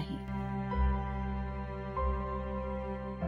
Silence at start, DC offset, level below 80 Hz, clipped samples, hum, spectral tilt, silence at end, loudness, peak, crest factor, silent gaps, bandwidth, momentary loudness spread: 0 s; under 0.1%; -38 dBFS; under 0.1%; none; -9 dB/octave; 0 s; -36 LUFS; -20 dBFS; 14 dB; none; 4.7 kHz; 6 LU